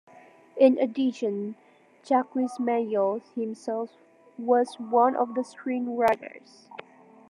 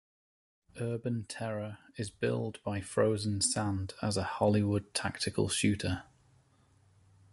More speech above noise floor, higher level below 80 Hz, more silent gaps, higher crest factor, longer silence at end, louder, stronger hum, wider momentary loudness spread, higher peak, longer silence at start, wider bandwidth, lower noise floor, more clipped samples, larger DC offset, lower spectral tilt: second, 27 dB vs 34 dB; second, -78 dBFS vs -54 dBFS; neither; about the same, 20 dB vs 20 dB; second, 0.5 s vs 1.3 s; first, -26 LUFS vs -33 LUFS; neither; first, 18 LU vs 10 LU; first, -8 dBFS vs -14 dBFS; second, 0.55 s vs 0.75 s; about the same, 11 kHz vs 11.5 kHz; second, -53 dBFS vs -66 dBFS; neither; neither; first, -6 dB/octave vs -4.5 dB/octave